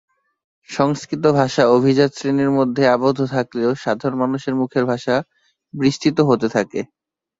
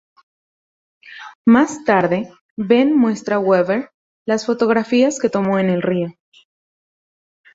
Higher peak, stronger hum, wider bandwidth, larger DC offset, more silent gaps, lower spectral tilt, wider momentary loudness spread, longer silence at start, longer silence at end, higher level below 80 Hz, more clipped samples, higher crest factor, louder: about the same, -2 dBFS vs -2 dBFS; neither; about the same, 7.8 kHz vs 8 kHz; neither; second, none vs 1.35-1.45 s, 2.41-2.56 s, 3.94-4.26 s; about the same, -6.5 dB/octave vs -6 dB/octave; second, 7 LU vs 14 LU; second, 0.7 s vs 1.05 s; second, 0.55 s vs 1.45 s; about the same, -56 dBFS vs -60 dBFS; neither; about the same, 16 dB vs 18 dB; about the same, -18 LUFS vs -17 LUFS